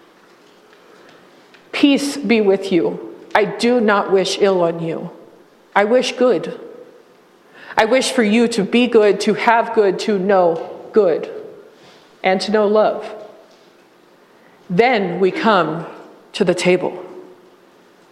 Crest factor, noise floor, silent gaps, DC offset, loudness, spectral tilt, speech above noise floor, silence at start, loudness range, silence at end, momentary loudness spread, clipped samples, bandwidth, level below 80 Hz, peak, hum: 18 dB; -50 dBFS; none; under 0.1%; -16 LUFS; -5 dB/octave; 34 dB; 1.75 s; 4 LU; 0.9 s; 14 LU; under 0.1%; 13.5 kHz; -62 dBFS; 0 dBFS; none